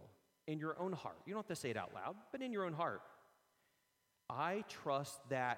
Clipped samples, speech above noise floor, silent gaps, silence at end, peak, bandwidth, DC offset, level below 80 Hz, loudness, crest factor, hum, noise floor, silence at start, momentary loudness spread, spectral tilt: under 0.1%; 39 dB; none; 0 s; -24 dBFS; 16.5 kHz; under 0.1%; -84 dBFS; -44 LUFS; 20 dB; none; -82 dBFS; 0 s; 8 LU; -5 dB/octave